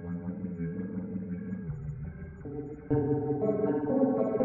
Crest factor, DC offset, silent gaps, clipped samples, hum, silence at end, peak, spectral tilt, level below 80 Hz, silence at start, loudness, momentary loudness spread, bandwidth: 16 dB; under 0.1%; none; under 0.1%; none; 0 s; -14 dBFS; -12.5 dB/octave; -54 dBFS; 0 s; -32 LUFS; 13 LU; 3 kHz